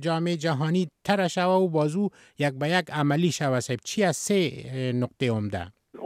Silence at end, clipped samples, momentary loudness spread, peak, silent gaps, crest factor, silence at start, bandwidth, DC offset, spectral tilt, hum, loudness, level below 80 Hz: 0 s; under 0.1%; 7 LU; -6 dBFS; none; 20 dB; 0 s; 15.5 kHz; under 0.1%; -5.5 dB/octave; none; -26 LUFS; -64 dBFS